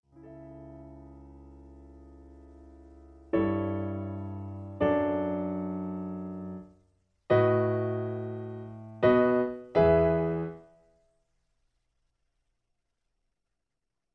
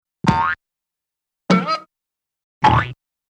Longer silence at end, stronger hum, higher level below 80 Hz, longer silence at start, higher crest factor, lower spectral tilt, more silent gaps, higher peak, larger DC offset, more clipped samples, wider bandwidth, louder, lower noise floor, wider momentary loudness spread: first, 3.55 s vs 0.35 s; neither; second, -54 dBFS vs -42 dBFS; about the same, 0.15 s vs 0.25 s; about the same, 20 dB vs 22 dB; first, -10 dB/octave vs -6 dB/octave; second, none vs 2.44-2.61 s; second, -10 dBFS vs 0 dBFS; neither; neither; second, 5.8 kHz vs 9.4 kHz; second, -29 LUFS vs -19 LUFS; about the same, -86 dBFS vs -85 dBFS; first, 24 LU vs 11 LU